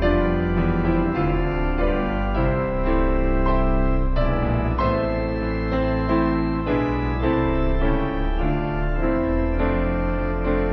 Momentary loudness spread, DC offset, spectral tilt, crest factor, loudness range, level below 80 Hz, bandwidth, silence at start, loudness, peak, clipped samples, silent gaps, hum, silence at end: 3 LU; under 0.1%; -10 dB/octave; 14 dB; 1 LU; -24 dBFS; 5.6 kHz; 0 s; -23 LUFS; -8 dBFS; under 0.1%; none; none; 0 s